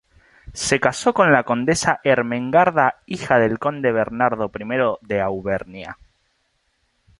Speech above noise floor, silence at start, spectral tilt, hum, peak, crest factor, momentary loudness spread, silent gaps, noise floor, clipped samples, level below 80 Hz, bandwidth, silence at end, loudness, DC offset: 48 dB; 0.45 s; -4.5 dB/octave; none; -2 dBFS; 18 dB; 11 LU; none; -68 dBFS; under 0.1%; -50 dBFS; 11.5 kHz; 1.25 s; -19 LUFS; under 0.1%